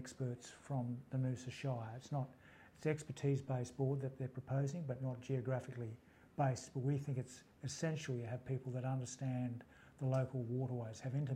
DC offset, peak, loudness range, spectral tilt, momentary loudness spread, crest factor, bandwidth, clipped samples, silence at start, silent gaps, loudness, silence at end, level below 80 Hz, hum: under 0.1%; -24 dBFS; 1 LU; -7 dB/octave; 10 LU; 18 dB; 10.5 kHz; under 0.1%; 0 s; none; -42 LUFS; 0 s; -76 dBFS; none